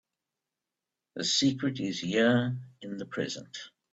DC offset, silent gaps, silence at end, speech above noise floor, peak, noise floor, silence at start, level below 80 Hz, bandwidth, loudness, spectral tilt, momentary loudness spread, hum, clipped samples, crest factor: under 0.1%; none; 0.25 s; 59 dB; -14 dBFS; -89 dBFS; 1.15 s; -70 dBFS; 8.4 kHz; -29 LUFS; -4 dB/octave; 17 LU; none; under 0.1%; 18 dB